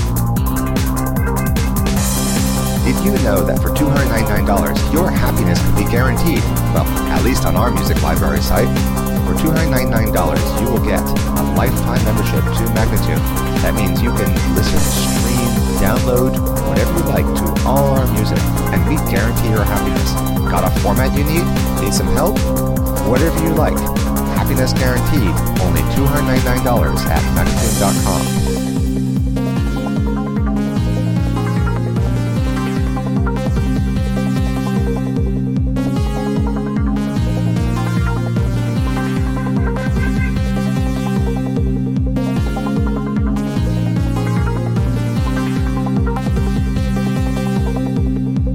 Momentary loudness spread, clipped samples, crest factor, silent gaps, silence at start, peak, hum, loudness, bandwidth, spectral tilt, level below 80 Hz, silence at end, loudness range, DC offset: 3 LU; under 0.1%; 14 dB; none; 0 s; 0 dBFS; none; -16 LUFS; 17 kHz; -6 dB/octave; -22 dBFS; 0 s; 3 LU; under 0.1%